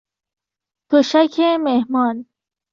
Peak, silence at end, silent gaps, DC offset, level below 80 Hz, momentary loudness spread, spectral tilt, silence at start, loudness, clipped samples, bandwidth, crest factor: -2 dBFS; 0.5 s; none; under 0.1%; -68 dBFS; 6 LU; -4.5 dB/octave; 0.9 s; -17 LUFS; under 0.1%; 7.4 kHz; 16 dB